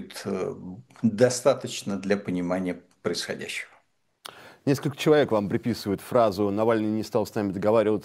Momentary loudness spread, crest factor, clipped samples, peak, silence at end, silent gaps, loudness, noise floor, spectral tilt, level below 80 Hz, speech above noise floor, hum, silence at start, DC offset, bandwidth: 13 LU; 20 dB; under 0.1%; -6 dBFS; 0 s; none; -26 LUFS; -65 dBFS; -5.5 dB/octave; -64 dBFS; 40 dB; none; 0 s; under 0.1%; 16 kHz